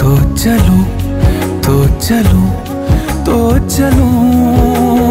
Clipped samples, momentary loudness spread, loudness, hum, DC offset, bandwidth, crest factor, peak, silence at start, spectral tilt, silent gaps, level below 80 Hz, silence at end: under 0.1%; 5 LU; -11 LUFS; none; 0.2%; 16.5 kHz; 10 dB; 0 dBFS; 0 s; -6.5 dB/octave; none; -18 dBFS; 0 s